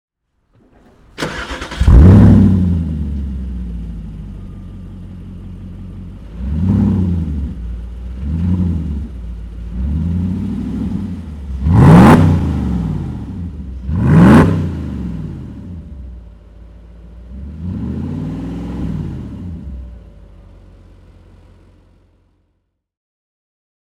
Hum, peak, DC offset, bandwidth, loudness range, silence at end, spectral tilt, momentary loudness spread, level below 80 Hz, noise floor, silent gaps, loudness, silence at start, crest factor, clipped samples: none; 0 dBFS; under 0.1%; 11.5 kHz; 16 LU; 3.4 s; -8.5 dB/octave; 25 LU; -24 dBFS; -67 dBFS; none; -14 LUFS; 1.2 s; 16 dB; 0.3%